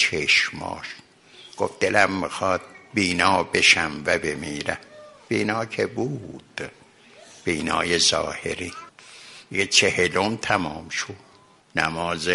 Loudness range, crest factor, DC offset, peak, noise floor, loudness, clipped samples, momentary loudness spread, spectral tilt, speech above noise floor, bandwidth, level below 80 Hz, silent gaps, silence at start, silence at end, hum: 7 LU; 22 dB; under 0.1%; -2 dBFS; -50 dBFS; -22 LUFS; under 0.1%; 18 LU; -2.5 dB/octave; 27 dB; 11.5 kHz; -54 dBFS; none; 0 s; 0 s; none